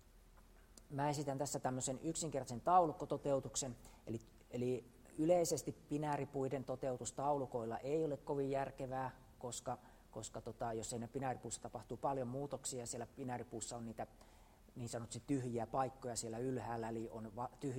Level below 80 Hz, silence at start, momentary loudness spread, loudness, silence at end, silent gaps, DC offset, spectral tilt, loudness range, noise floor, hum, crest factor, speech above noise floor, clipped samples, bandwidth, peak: -66 dBFS; 0.15 s; 10 LU; -42 LUFS; 0 s; none; under 0.1%; -5 dB/octave; 7 LU; -64 dBFS; none; 22 dB; 22 dB; under 0.1%; 16 kHz; -20 dBFS